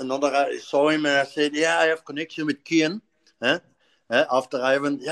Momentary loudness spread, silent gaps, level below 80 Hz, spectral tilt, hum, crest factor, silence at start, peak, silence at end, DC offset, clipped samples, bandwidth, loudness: 8 LU; none; -78 dBFS; -3.5 dB/octave; none; 18 dB; 0 s; -6 dBFS; 0 s; under 0.1%; under 0.1%; 11.5 kHz; -23 LUFS